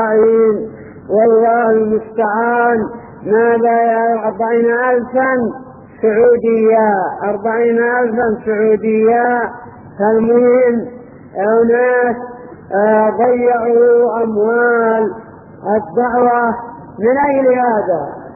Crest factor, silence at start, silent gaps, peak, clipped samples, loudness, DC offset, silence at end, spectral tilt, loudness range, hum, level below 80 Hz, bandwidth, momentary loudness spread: 12 dB; 0 s; none; 0 dBFS; under 0.1%; -13 LUFS; under 0.1%; 0 s; -7.5 dB/octave; 2 LU; none; -52 dBFS; 3 kHz; 10 LU